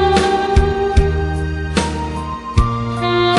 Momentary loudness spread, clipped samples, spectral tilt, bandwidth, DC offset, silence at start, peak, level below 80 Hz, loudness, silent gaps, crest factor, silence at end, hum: 7 LU; under 0.1%; -6 dB/octave; 11.5 kHz; under 0.1%; 0 s; -2 dBFS; -22 dBFS; -17 LUFS; none; 14 dB; 0 s; none